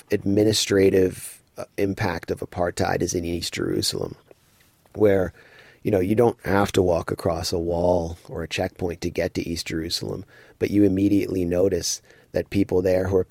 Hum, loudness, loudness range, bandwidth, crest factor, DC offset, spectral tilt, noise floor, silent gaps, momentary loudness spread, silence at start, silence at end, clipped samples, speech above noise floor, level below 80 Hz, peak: none; -23 LUFS; 4 LU; 16.5 kHz; 16 dB; under 0.1%; -5 dB/octave; -59 dBFS; none; 12 LU; 0.1 s; 0.05 s; under 0.1%; 36 dB; -46 dBFS; -6 dBFS